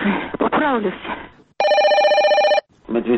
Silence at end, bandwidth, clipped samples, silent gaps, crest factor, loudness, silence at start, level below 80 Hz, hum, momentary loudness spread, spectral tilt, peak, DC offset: 0 s; 8.2 kHz; under 0.1%; none; 12 dB; -17 LUFS; 0 s; -52 dBFS; none; 13 LU; -5 dB/octave; -6 dBFS; under 0.1%